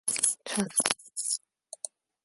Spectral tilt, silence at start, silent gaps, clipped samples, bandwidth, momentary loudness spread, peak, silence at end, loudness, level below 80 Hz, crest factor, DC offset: -1 dB/octave; 0.05 s; none; under 0.1%; 12 kHz; 15 LU; -2 dBFS; 0.4 s; -28 LUFS; -70 dBFS; 30 dB; under 0.1%